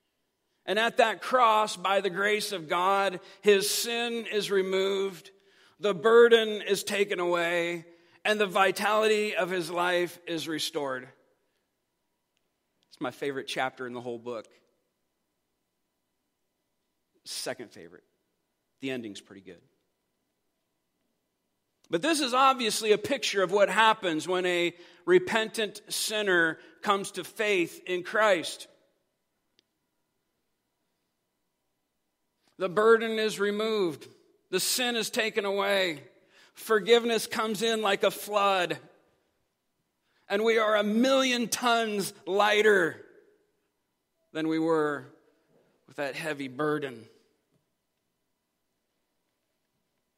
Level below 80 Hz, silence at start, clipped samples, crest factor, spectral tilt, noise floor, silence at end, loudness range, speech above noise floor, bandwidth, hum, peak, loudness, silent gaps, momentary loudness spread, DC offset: -84 dBFS; 0.65 s; under 0.1%; 22 dB; -3 dB/octave; -80 dBFS; 3.15 s; 15 LU; 53 dB; 16 kHz; none; -8 dBFS; -27 LUFS; none; 14 LU; under 0.1%